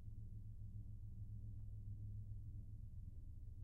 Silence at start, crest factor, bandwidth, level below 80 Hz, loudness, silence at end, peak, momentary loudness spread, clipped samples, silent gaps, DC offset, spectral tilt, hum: 0 s; 12 dB; 1.1 kHz; -54 dBFS; -55 LUFS; 0 s; -40 dBFS; 4 LU; under 0.1%; none; under 0.1%; -10 dB/octave; none